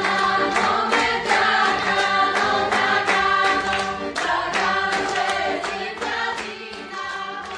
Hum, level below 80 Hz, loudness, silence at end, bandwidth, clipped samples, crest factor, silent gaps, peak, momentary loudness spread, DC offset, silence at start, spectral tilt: none; -52 dBFS; -20 LUFS; 0 s; 10.5 kHz; under 0.1%; 16 dB; none; -6 dBFS; 11 LU; under 0.1%; 0 s; -2.5 dB/octave